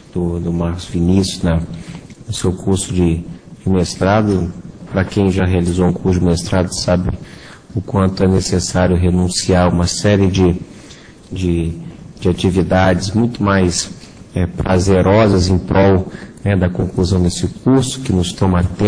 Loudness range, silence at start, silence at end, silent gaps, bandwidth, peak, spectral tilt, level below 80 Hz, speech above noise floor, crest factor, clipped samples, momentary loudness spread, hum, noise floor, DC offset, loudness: 3 LU; 0.15 s; 0 s; none; 10.5 kHz; 0 dBFS; -6 dB/octave; -32 dBFS; 24 dB; 16 dB; under 0.1%; 13 LU; none; -38 dBFS; under 0.1%; -15 LUFS